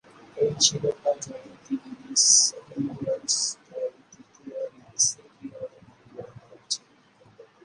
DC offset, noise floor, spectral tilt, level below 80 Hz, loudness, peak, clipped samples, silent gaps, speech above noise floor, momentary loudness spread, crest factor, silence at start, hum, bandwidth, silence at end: under 0.1%; -58 dBFS; -1.5 dB/octave; -68 dBFS; -24 LUFS; -4 dBFS; under 0.1%; none; 32 dB; 24 LU; 24 dB; 0.35 s; none; 11.5 kHz; 0.25 s